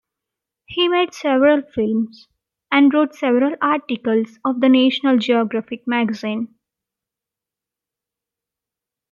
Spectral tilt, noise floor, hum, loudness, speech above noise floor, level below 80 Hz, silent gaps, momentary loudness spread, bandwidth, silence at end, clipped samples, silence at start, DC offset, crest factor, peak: -5.5 dB/octave; -87 dBFS; none; -18 LUFS; 69 dB; -64 dBFS; none; 10 LU; 7.2 kHz; 2.65 s; under 0.1%; 0.7 s; under 0.1%; 18 dB; -2 dBFS